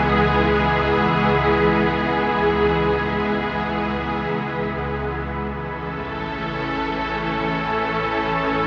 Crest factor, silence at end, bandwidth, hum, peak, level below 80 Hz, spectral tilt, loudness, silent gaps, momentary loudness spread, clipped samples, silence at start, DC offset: 16 dB; 0 s; 7 kHz; none; -6 dBFS; -34 dBFS; -7.5 dB/octave; -21 LUFS; none; 9 LU; under 0.1%; 0 s; under 0.1%